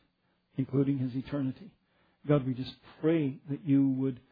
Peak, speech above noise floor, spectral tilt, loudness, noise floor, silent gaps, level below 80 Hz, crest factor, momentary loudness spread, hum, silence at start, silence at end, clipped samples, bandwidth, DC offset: -14 dBFS; 44 dB; -11 dB/octave; -31 LUFS; -74 dBFS; none; -66 dBFS; 18 dB; 13 LU; none; 0.55 s; 0.15 s; under 0.1%; 5 kHz; under 0.1%